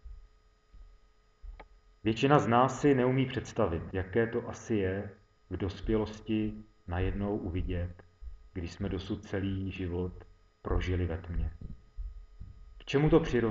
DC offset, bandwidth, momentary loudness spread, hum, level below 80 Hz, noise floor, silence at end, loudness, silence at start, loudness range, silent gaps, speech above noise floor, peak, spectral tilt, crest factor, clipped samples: under 0.1%; 7.8 kHz; 23 LU; none; -44 dBFS; -62 dBFS; 0 s; -32 LUFS; 0.05 s; 8 LU; none; 32 dB; -10 dBFS; -7 dB/octave; 22 dB; under 0.1%